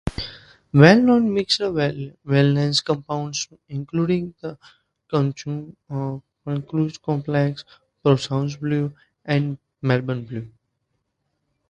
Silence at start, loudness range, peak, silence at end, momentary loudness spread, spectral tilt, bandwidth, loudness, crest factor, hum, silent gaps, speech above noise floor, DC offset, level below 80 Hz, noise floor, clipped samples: 0.05 s; 8 LU; 0 dBFS; 1.2 s; 15 LU; -6 dB/octave; 10 kHz; -21 LUFS; 22 dB; none; none; 54 dB; under 0.1%; -50 dBFS; -74 dBFS; under 0.1%